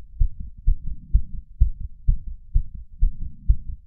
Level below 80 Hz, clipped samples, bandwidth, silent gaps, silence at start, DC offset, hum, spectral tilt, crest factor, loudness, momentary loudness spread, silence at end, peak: -22 dBFS; under 0.1%; 0.3 kHz; none; 0 s; under 0.1%; none; -17 dB/octave; 18 dB; -29 LUFS; 6 LU; 0.1 s; -4 dBFS